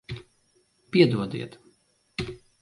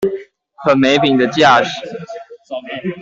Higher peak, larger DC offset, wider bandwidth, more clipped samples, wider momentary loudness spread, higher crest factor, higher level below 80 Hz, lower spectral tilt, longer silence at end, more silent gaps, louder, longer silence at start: second, -6 dBFS vs -2 dBFS; neither; first, 11.5 kHz vs 7.8 kHz; neither; about the same, 20 LU vs 19 LU; first, 24 dB vs 14 dB; about the same, -56 dBFS vs -56 dBFS; first, -7 dB/octave vs -5 dB/octave; first, 0.25 s vs 0 s; neither; second, -25 LUFS vs -13 LUFS; about the same, 0.1 s vs 0 s